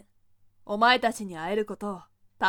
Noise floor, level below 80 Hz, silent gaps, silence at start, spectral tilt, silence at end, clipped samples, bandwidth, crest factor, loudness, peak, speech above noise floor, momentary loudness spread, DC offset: -61 dBFS; -62 dBFS; none; 0.65 s; -3.5 dB/octave; 0 s; under 0.1%; 18 kHz; 22 dB; -26 LUFS; -8 dBFS; 35 dB; 15 LU; under 0.1%